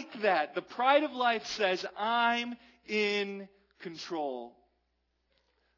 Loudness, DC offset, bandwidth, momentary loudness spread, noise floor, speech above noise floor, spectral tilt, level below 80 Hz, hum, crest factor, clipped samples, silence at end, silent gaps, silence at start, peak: -30 LUFS; under 0.1%; 6 kHz; 18 LU; -78 dBFS; 47 dB; -3.5 dB/octave; -78 dBFS; none; 20 dB; under 0.1%; 1.3 s; none; 0 s; -14 dBFS